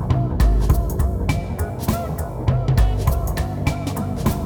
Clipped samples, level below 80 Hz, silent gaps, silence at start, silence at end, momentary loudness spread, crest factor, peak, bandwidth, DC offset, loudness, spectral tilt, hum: under 0.1%; -22 dBFS; none; 0 s; 0 s; 6 LU; 14 dB; -6 dBFS; over 20 kHz; under 0.1%; -21 LUFS; -7 dB/octave; none